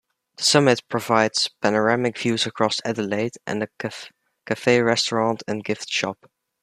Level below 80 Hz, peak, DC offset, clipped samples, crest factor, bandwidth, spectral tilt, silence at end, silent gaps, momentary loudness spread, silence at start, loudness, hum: -66 dBFS; -2 dBFS; under 0.1%; under 0.1%; 20 dB; 15 kHz; -3.5 dB/octave; 0.5 s; none; 11 LU; 0.4 s; -22 LUFS; none